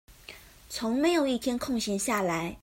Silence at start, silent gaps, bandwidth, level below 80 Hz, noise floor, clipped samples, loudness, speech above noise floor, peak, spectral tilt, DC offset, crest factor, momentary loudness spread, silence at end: 0.1 s; none; 16.5 kHz; -56 dBFS; -50 dBFS; under 0.1%; -28 LUFS; 22 dB; -14 dBFS; -4 dB/octave; under 0.1%; 16 dB; 22 LU; 0.05 s